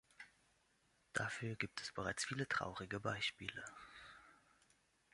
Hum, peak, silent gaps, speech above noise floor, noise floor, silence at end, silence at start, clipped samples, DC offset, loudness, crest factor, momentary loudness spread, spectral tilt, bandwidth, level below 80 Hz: none; -24 dBFS; none; 33 dB; -78 dBFS; 0.8 s; 0.2 s; under 0.1%; under 0.1%; -44 LUFS; 24 dB; 19 LU; -3.5 dB/octave; 11.5 kHz; -72 dBFS